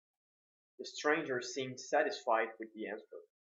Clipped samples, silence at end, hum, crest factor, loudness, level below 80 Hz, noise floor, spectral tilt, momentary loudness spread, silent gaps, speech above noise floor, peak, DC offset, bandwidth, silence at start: under 0.1%; 0.35 s; none; 20 dB; -36 LUFS; under -90 dBFS; under -90 dBFS; -3 dB/octave; 15 LU; none; over 53 dB; -18 dBFS; under 0.1%; 8 kHz; 0.8 s